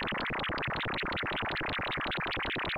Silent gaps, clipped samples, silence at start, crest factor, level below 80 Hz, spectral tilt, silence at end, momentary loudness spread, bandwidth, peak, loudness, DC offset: none; under 0.1%; 0 s; 6 dB; -50 dBFS; -6 dB/octave; 0 s; 0 LU; 16 kHz; -28 dBFS; -33 LUFS; under 0.1%